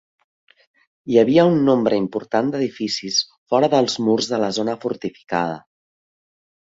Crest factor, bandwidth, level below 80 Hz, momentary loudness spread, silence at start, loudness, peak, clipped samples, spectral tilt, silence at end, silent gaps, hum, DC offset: 18 dB; 8 kHz; -62 dBFS; 11 LU; 1.05 s; -19 LUFS; -2 dBFS; under 0.1%; -5 dB/octave; 1.05 s; 3.38-3.46 s; none; under 0.1%